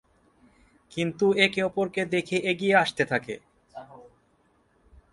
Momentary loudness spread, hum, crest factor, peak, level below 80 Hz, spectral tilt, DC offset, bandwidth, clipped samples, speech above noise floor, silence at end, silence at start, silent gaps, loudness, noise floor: 23 LU; none; 22 dB; -6 dBFS; -64 dBFS; -5 dB/octave; under 0.1%; 11.5 kHz; under 0.1%; 41 dB; 1.1 s; 0.95 s; none; -25 LUFS; -66 dBFS